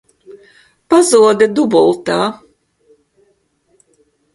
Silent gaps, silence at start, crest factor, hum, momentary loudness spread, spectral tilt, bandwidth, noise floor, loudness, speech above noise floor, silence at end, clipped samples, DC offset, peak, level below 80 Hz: none; 0.3 s; 16 dB; none; 8 LU; -4 dB/octave; 11.5 kHz; -60 dBFS; -12 LUFS; 49 dB; 2 s; under 0.1%; under 0.1%; 0 dBFS; -58 dBFS